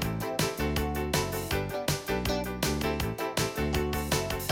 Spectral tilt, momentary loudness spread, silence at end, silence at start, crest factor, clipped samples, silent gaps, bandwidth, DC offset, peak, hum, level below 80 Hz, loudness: -4.5 dB/octave; 2 LU; 0 s; 0 s; 18 dB; under 0.1%; none; 17 kHz; under 0.1%; -12 dBFS; none; -40 dBFS; -30 LUFS